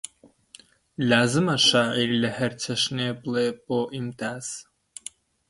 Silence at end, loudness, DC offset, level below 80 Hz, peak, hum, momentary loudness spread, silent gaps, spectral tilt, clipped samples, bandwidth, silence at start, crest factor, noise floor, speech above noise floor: 0.85 s; -24 LUFS; under 0.1%; -64 dBFS; -4 dBFS; none; 21 LU; none; -4 dB/octave; under 0.1%; 11.5 kHz; 0.25 s; 22 dB; -53 dBFS; 29 dB